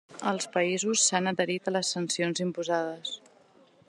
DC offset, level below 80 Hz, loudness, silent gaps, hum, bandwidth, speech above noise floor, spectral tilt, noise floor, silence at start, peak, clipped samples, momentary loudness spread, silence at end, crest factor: under 0.1%; -82 dBFS; -28 LUFS; none; none; 12.5 kHz; 31 dB; -3 dB/octave; -60 dBFS; 0.1 s; -10 dBFS; under 0.1%; 10 LU; 0.7 s; 20 dB